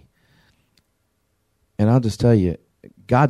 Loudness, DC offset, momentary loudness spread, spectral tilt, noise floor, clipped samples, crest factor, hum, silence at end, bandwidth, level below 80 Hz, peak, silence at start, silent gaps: -19 LUFS; under 0.1%; 16 LU; -8 dB/octave; -69 dBFS; under 0.1%; 18 dB; none; 0 s; 12 kHz; -46 dBFS; -4 dBFS; 1.8 s; none